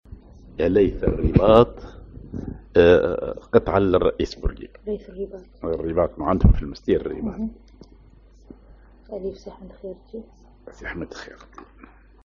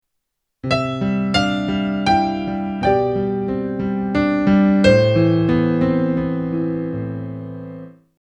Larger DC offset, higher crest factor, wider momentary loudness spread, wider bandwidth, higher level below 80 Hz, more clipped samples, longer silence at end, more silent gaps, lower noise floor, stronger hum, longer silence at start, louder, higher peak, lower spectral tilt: neither; about the same, 22 dB vs 18 dB; first, 23 LU vs 14 LU; second, 7.2 kHz vs 9.8 kHz; first, -32 dBFS vs -42 dBFS; neither; first, 0.6 s vs 0.35 s; neither; second, -50 dBFS vs -76 dBFS; neither; second, 0.1 s vs 0.65 s; second, -21 LUFS vs -18 LUFS; about the same, 0 dBFS vs 0 dBFS; about the same, -6.5 dB/octave vs -7.5 dB/octave